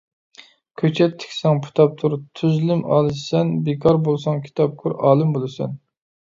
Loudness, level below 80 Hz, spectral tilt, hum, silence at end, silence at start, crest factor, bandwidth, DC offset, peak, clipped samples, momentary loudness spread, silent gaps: -20 LUFS; -56 dBFS; -8 dB/octave; none; 0.55 s; 0.8 s; 18 dB; 7.6 kHz; under 0.1%; -2 dBFS; under 0.1%; 7 LU; none